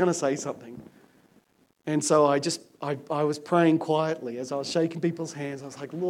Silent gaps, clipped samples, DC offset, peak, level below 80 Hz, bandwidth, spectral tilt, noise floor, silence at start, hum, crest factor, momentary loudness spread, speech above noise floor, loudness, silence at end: none; under 0.1%; under 0.1%; -8 dBFS; -76 dBFS; 15.5 kHz; -5 dB/octave; -64 dBFS; 0 s; none; 18 dB; 16 LU; 37 dB; -26 LUFS; 0 s